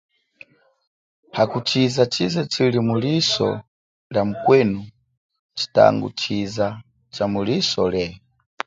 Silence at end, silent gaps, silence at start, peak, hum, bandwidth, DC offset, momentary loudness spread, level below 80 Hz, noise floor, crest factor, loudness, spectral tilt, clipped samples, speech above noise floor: 0.5 s; 3.68-4.10 s, 5.17-5.29 s, 5.39-5.49 s; 1.35 s; 0 dBFS; none; 9.2 kHz; under 0.1%; 13 LU; -54 dBFS; -50 dBFS; 20 dB; -20 LUFS; -5.5 dB/octave; under 0.1%; 30 dB